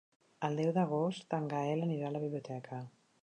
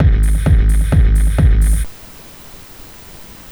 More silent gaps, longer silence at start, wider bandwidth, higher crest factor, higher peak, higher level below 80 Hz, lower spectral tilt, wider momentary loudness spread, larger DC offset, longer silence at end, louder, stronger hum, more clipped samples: neither; first, 0.4 s vs 0 s; second, 9.6 kHz vs over 20 kHz; about the same, 16 dB vs 12 dB; second, -20 dBFS vs -2 dBFS; second, -82 dBFS vs -14 dBFS; about the same, -7.5 dB/octave vs -6.5 dB/octave; second, 12 LU vs 22 LU; neither; about the same, 0.35 s vs 0.25 s; second, -36 LUFS vs -14 LUFS; neither; neither